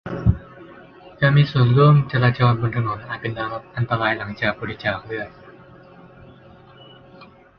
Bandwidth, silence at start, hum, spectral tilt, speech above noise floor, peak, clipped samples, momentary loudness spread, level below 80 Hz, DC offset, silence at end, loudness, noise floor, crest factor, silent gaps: 5.6 kHz; 0.05 s; none; -9.5 dB/octave; 27 dB; -2 dBFS; under 0.1%; 13 LU; -40 dBFS; under 0.1%; 0.35 s; -20 LUFS; -46 dBFS; 18 dB; none